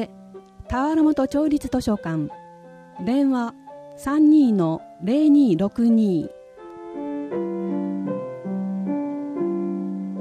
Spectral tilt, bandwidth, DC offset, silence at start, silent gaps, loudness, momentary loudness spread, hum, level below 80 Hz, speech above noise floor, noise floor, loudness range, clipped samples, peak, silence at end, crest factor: -8 dB/octave; 10.5 kHz; under 0.1%; 0 s; none; -22 LUFS; 16 LU; none; -50 dBFS; 26 dB; -45 dBFS; 8 LU; under 0.1%; -8 dBFS; 0 s; 14 dB